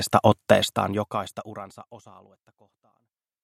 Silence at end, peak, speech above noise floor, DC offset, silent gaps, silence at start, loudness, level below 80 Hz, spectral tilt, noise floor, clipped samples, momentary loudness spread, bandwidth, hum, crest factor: 1.45 s; -2 dBFS; 51 dB; under 0.1%; none; 0 s; -23 LUFS; -62 dBFS; -5 dB/octave; -76 dBFS; under 0.1%; 21 LU; 16 kHz; none; 26 dB